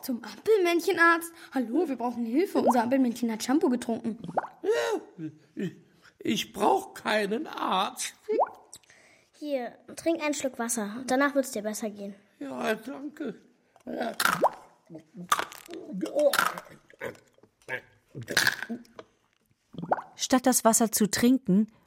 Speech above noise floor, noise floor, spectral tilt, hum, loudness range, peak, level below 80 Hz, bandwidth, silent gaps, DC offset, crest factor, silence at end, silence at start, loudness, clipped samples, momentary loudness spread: 42 dB; -70 dBFS; -3.5 dB/octave; none; 6 LU; -8 dBFS; -70 dBFS; 16.5 kHz; none; under 0.1%; 20 dB; 0.2 s; 0 s; -27 LUFS; under 0.1%; 17 LU